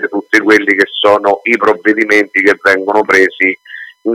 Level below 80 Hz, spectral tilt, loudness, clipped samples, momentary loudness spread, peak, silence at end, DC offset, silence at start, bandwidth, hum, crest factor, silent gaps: -54 dBFS; -3.5 dB/octave; -10 LUFS; 0.6%; 5 LU; 0 dBFS; 0 s; under 0.1%; 0 s; 15.5 kHz; none; 12 dB; none